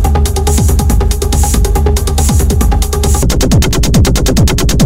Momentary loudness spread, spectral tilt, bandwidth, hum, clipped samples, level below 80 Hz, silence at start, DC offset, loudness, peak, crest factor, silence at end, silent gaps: 2 LU; -5 dB/octave; 16.5 kHz; none; 0.5%; -12 dBFS; 0 s; under 0.1%; -11 LUFS; 0 dBFS; 8 dB; 0 s; none